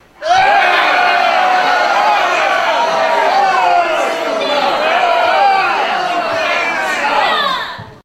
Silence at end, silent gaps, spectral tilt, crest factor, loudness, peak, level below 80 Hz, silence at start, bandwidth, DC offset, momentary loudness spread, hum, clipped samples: 0.1 s; none; -2 dB/octave; 12 dB; -12 LUFS; 0 dBFS; -54 dBFS; 0.2 s; 15 kHz; under 0.1%; 5 LU; none; under 0.1%